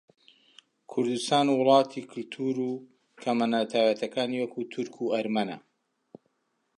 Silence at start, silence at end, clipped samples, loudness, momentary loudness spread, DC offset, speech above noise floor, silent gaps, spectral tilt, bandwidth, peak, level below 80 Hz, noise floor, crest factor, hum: 0.9 s; 1.2 s; under 0.1%; -27 LUFS; 13 LU; under 0.1%; 48 dB; none; -5 dB/octave; 11.5 kHz; -8 dBFS; -80 dBFS; -75 dBFS; 20 dB; none